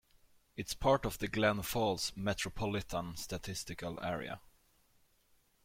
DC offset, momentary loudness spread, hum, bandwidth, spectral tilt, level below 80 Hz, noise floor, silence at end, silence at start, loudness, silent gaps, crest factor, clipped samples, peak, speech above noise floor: under 0.1%; 11 LU; none; 16.5 kHz; -4.5 dB/octave; -56 dBFS; -71 dBFS; 1.25 s; 0.55 s; -36 LUFS; none; 22 dB; under 0.1%; -16 dBFS; 35 dB